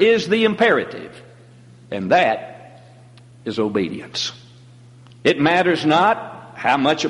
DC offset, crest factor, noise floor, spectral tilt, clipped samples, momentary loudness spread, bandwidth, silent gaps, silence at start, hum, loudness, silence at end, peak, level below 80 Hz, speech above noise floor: under 0.1%; 16 dB; -45 dBFS; -5 dB/octave; under 0.1%; 16 LU; 11.5 kHz; none; 0 s; none; -18 LUFS; 0 s; -4 dBFS; -60 dBFS; 27 dB